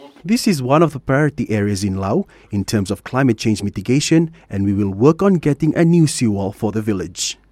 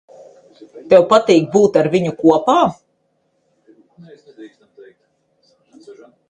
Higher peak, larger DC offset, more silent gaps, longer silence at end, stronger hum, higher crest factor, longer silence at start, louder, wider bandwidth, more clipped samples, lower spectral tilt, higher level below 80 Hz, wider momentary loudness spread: about the same, 0 dBFS vs 0 dBFS; neither; neither; second, 0.2 s vs 0.4 s; neither; about the same, 16 dB vs 18 dB; second, 0 s vs 0.75 s; second, -17 LUFS vs -13 LUFS; first, 15 kHz vs 9.6 kHz; neither; about the same, -6 dB/octave vs -6 dB/octave; first, -46 dBFS vs -58 dBFS; first, 8 LU vs 5 LU